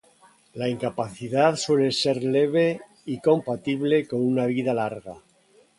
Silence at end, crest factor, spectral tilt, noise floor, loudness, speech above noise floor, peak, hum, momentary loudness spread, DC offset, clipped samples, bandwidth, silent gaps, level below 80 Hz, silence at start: 0.6 s; 18 dB; -5.5 dB/octave; -59 dBFS; -24 LUFS; 36 dB; -6 dBFS; none; 11 LU; under 0.1%; under 0.1%; 11.5 kHz; none; -64 dBFS; 0.55 s